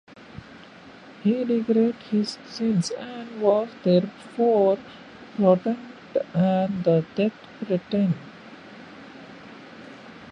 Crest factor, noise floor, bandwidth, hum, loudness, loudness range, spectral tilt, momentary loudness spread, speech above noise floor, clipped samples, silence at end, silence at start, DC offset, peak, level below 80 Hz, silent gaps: 20 dB; -46 dBFS; 10.5 kHz; none; -24 LUFS; 4 LU; -7.5 dB/octave; 22 LU; 23 dB; under 0.1%; 0 s; 0.35 s; under 0.1%; -4 dBFS; -64 dBFS; none